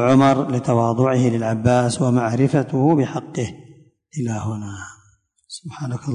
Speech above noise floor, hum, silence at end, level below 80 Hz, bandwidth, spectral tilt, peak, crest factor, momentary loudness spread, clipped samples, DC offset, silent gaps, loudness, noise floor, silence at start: 40 dB; none; 0 s; -50 dBFS; 10.5 kHz; -7 dB/octave; -2 dBFS; 16 dB; 17 LU; under 0.1%; under 0.1%; none; -19 LUFS; -58 dBFS; 0 s